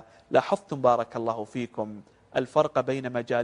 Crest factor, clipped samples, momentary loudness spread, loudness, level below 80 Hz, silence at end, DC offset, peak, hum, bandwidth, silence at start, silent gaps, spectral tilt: 22 dB; under 0.1%; 10 LU; -27 LUFS; -66 dBFS; 0 s; under 0.1%; -6 dBFS; none; 10.5 kHz; 0.3 s; none; -6.5 dB/octave